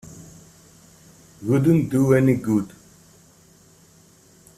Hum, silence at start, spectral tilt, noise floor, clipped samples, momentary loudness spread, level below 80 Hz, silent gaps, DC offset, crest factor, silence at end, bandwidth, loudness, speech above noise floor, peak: none; 0.05 s; -8 dB/octave; -53 dBFS; under 0.1%; 22 LU; -54 dBFS; none; under 0.1%; 20 dB; 1.9 s; 14.5 kHz; -20 LUFS; 35 dB; -4 dBFS